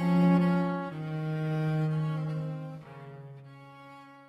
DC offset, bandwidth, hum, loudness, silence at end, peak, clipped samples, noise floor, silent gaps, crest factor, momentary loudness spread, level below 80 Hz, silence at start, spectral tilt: under 0.1%; 5.6 kHz; none; -29 LUFS; 0.05 s; -14 dBFS; under 0.1%; -50 dBFS; none; 16 dB; 25 LU; -66 dBFS; 0 s; -9 dB/octave